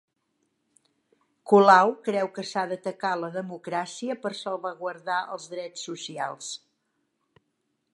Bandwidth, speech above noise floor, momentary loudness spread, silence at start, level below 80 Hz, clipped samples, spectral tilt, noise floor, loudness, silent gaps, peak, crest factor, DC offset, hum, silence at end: 11.5 kHz; 51 dB; 17 LU; 1.45 s; -86 dBFS; under 0.1%; -4.5 dB/octave; -77 dBFS; -26 LUFS; none; -2 dBFS; 24 dB; under 0.1%; none; 1.4 s